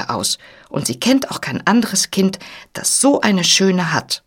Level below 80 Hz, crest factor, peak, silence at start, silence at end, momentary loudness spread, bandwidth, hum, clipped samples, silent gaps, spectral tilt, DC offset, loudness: -56 dBFS; 18 dB; 0 dBFS; 0 s; 0.1 s; 11 LU; 17.5 kHz; none; under 0.1%; none; -3 dB/octave; under 0.1%; -16 LUFS